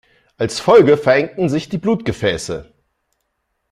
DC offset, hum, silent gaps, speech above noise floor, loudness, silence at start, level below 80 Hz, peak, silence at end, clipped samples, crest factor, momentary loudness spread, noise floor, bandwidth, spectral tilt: under 0.1%; none; none; 56 dB; -16 LUFS; 0.4 s; -48 dBFS; -2 dBFS; 1.1 s; under 0.1%; 16 dB; 14 LU; -71 dBFS; 12.5 kHz; -5.5 dB/octave